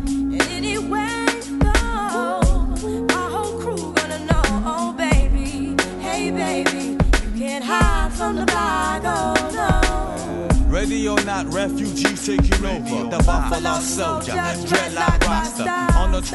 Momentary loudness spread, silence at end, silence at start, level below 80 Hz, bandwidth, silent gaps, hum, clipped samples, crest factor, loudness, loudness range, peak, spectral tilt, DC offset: 5 LU; 0 s; 0 s; -24 dBFS; 12 kHz; none; none; under 0.1%; 18 dB; -21 LUFS; 1 LU; 0 dBFS; -4.5 dB/octave; under 0.1%